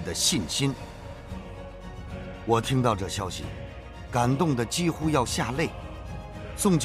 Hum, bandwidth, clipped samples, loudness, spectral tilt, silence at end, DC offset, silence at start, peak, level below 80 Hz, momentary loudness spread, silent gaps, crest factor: none; 15.5 kHz; under 0.1%; -26 LUFS; -4.5 dB/octave; 0 s; under 0.1%; 0 s; -8 dBFS; -44 dBFS; 17 LU; none; 20 dB